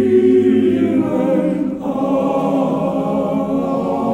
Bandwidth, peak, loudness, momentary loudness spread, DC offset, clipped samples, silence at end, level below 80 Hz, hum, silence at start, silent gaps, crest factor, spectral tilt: 9 kHz; -2 dBFS; -16 LUFS; 7 LU; under 0.1%; under 0.1%; 0 s; -48 dBFS; none; 0 s; none; 14 dB; -8.5 dB/octave